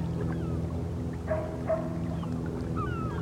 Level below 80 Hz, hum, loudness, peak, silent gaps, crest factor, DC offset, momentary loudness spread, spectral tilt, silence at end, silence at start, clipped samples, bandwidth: -42 dBFS; none; -33 LUFS; -18 dBFS; none; 14 dB; under 0.1%; 3 LU; -8.5 dB/octave; 0 s; 0 s; under 0.1%; 11.5 kHz